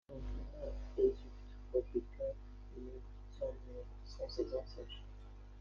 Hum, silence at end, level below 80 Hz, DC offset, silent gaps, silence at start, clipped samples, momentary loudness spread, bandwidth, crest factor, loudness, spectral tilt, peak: none; 0 s; -50 dBFS; under 0.1%; none; 0.1 s; under 0.1%; 19 LU; 7 kHz; 22 dB; -43 LUFS; -7.5 dB/octave; -22 dBFS